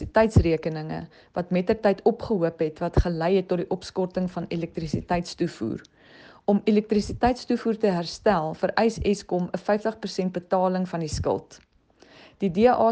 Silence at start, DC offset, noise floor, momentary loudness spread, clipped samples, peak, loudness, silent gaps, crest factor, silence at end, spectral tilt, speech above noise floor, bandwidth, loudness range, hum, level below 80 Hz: 0 s; under 0.1%; -55 dBFS; 9 LU; under 0.1%; -4 dBFS; -25 LUFS; none; 20 dB; 0 s; -7 dB/octave; 31 dB; 9.4 kHz; 4 LU; none; -40 dBFS